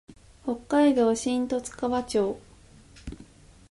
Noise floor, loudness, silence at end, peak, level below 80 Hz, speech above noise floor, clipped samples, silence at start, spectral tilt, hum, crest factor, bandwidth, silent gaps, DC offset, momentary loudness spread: -52 dBFS; -26 LUFS; 0.45 s; -10 dBFS; -52 dBFS; 28 dB; under 0.1%; 0.1 s; -4.5 dB/octave; none; 16 dB; 11.5 kHz; none; under 0.1%; 22 LU